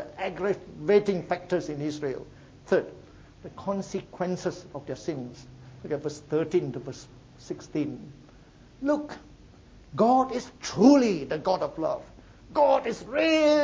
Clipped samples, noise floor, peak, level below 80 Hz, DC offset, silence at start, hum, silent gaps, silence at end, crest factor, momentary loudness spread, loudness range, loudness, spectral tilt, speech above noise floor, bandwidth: under 0.1%; -52 dBFS; -4 dBFS; -58 dBFS; under 0.1%; 0 s; none; none; 0 s; 22 dB; 19 LU; 9 LU; -27 LUFS; -6 dB/octave; 26 dB; 8 kHz